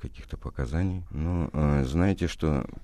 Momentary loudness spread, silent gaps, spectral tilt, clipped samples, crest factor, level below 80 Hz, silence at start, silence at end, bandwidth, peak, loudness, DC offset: 12 LU; none; -7.5 dB/octave; under 0.1%; 16 dB; -36 dBFS; 0 s; 0 s; 12 kHz; -10 dBFS; -28 LUFS; under 0.1%